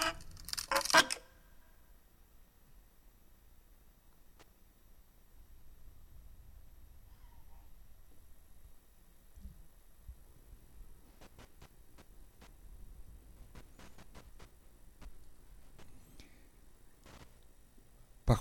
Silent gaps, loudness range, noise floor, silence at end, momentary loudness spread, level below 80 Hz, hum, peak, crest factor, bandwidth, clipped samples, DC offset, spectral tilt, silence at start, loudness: none; 29 LU; -61 dBFS; 0 s; 28 LU; -54 dBFS; none; -12 dBFS; 32 dB; over 20 kHz; under 0.1%; under 0.1%; -3 dB/octave; 0 s; -32 LUFS